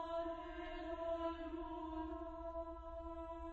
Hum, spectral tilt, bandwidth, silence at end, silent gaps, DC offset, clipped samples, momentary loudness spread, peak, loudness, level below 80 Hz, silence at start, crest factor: none; -5 dB/octave; 7.8 kHz; 0 s; none; under 0.1%; under 0.1%; 6 LU; -30 dBFS; -47 LUFS; -56 dBFS; 0 s; 16 dB